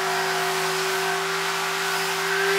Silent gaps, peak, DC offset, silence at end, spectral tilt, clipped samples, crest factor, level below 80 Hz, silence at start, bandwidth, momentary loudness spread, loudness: none; -10 dBFS; under 0.1%; 0 s; -1.5 dB/octave; under 0.1%; 14 dB; -80 dBFS; 0 s; 16 kHz; 1 LU; -23 LUFS